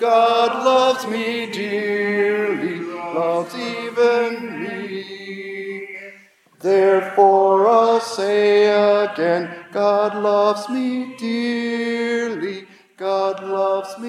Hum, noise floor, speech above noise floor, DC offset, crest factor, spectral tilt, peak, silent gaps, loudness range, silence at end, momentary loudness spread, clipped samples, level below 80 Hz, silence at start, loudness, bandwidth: none; -49 dBFS; 32 dB; under 0.1%; 18 dB; -4.5 dB/octave; -2 dBFS; none; 7 LU; 0 s; 14 LU; under 0.1%; -82 dBFS; 0 s; -19 LUFS; 13.5 kHz